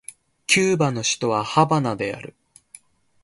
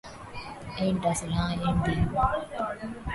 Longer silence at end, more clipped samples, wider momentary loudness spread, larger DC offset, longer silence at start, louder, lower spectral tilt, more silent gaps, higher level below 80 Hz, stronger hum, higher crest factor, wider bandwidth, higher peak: first, 0.95 s vs 0 s; neither; first, 18 LU vs 14 LU; neither; first, 0.5 s vs 0.05 s; first, -20 LUFS vs -28 LUFS; second, -4 dB/octave vs -6 dB/octave; neither; second, -60 dBFS vs -40 dBFS; neither; about the same, 20 dB vs 18 dB; about the same, 11.5 kHz vs 11.5 kHz; first, -2 dBFS vs -12 dBFS